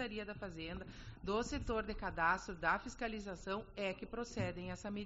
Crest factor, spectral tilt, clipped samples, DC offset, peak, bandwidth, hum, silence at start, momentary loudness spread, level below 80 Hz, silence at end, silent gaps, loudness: 20 dB; -3.5 dB/octave; under 0.1%; under 0.1%; -22 dBFS; 7.6 kHz; none; 0 s; 11 LU; -54 dBFS; 0 s; none; -41 LUFS